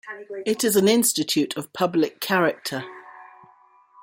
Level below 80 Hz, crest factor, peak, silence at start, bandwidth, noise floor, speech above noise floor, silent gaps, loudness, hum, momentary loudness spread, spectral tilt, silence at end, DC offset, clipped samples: -68 dBFS; 18 dB; -6 dBFS; 0.05 s; 16.5 kHz; -55 dBFS; 33 dB; none; -22 LUFS; none; 15 LU; -3.5 dB/octave; 0.75 s; under 0.1%; under 0.1%